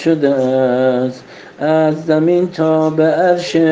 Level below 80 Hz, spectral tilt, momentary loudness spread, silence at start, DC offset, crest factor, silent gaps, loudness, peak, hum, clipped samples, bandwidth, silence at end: -60 dBFS; -7 dB/octave; 5 LU; 0 s; under 0.1%; 12 dB; none; -14 LUFS; -2 dBFS; none; under 0.1%; 7.8 kHz; 0 s